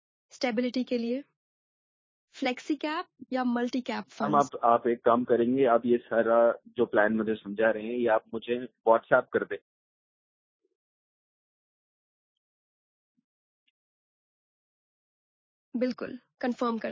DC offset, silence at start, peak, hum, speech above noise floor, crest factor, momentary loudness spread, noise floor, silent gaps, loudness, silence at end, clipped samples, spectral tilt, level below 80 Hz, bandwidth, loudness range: under 0.1%; 0.35 s; -8 dBFS; none; over 63 dB; 22 dB; 10 LU; under -90 dBFS; 1.36-2.28 s, 9.62-10.59 s, 10.75-13.15 s, 13.24-15.72 s; -28 LUFS; 0 s; under 0.1%; -6 dB/octave; -72 dBFS; 7.6 kHz; 13 LU